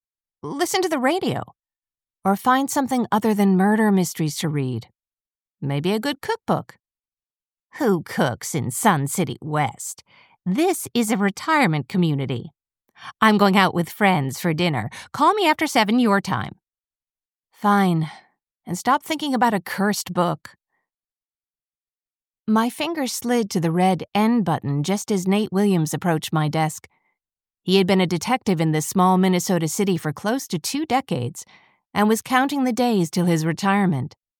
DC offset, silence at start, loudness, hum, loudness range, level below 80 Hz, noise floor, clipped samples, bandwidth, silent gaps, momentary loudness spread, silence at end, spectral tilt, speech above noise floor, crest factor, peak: under 0.1%; 0.45 s; -21 LUFS; none; 5 LU; -66 dBFS; under -90 dBFS; under 0.1%; 19 kHz; 21.50-21.54 s; 10 LU; 0.3 s; -5 dB/octave; over 69 dB; 20 dB; -2 dBFS